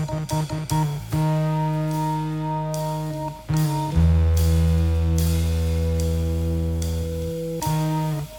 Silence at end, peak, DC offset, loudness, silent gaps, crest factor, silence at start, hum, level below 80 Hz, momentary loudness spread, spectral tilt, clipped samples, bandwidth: 0 s; -8 dBFS; under 0.1%; -23 LUFS; none; 14 dB; 0 s; none; -28 dBFS; 7 LU; -7 dB/octave; under 0.1%; 18.5 kHz